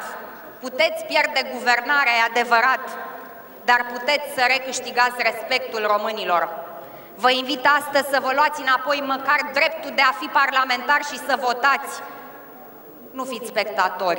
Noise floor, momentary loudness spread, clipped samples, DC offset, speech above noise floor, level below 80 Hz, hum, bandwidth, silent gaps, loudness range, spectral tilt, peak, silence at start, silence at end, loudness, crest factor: -42 dBFS; 18 LU; under 0.1%; under 0.1%; 21 dB; -70 dBFS; none; over 20 kHz; none; 3 LU; -1.5 dB/octave; -2 dBFS; 0 s; 0 s; -20 LUFS; 20 dB